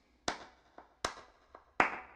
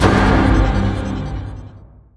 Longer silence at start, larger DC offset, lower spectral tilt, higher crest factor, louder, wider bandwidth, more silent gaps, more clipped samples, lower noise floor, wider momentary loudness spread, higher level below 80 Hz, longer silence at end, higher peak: first, 0.25 s vs 0 s; neither; second, -2 dB/octave vs -7 dB/octave; first, 32 dB vs 16 dB; second, -37 LUFS vs -17 LUFS; first, 14.5 kHz vs 11 kHz; neither; neither; first, -61 dBFS vs -40 dBFS; first, 24 LU vs 17 LU; second, -66 dBFS vs -22 dBFS; second, 0 s vs 0.4 s; second, -8 dBFS vs 0 dBFS